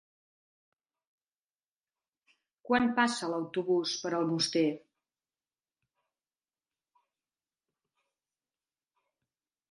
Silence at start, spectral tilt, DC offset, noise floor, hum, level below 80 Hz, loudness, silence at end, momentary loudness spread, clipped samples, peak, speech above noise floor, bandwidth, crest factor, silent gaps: 2.65 s; -4 dB/octave; under 0.1%; under -90 dBFS; none; -74 dBFS; -30 LUFS; 4.95 s; 6 LU; under 0.1%; -12 dBFS; over 60 dB; 11.5 kHz; 24 dB; none